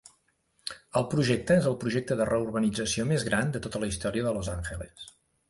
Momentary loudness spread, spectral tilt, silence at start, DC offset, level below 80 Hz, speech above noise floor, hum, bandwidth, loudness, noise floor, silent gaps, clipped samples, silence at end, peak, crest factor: 15 LU; -5.5 dB/octave; 0.65 s; under 0.1%; -48 dBFS; 43 dB; none; 11.5 kHz; -28 LUFS; -71 dBFS; none; under 0.1%; 0.4 s; -10 dBFS; 18 dB